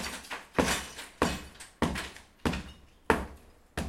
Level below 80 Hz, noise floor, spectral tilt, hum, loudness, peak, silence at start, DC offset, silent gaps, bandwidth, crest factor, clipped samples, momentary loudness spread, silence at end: -46 dBFS; -53 dBFS; -4 dB/octave; none; -33 LUFS; -4 dBFS; 0 s; under 0.1%; none; 16.5 kHz; 30 dB; under 0.1%; 13 LU; 0 s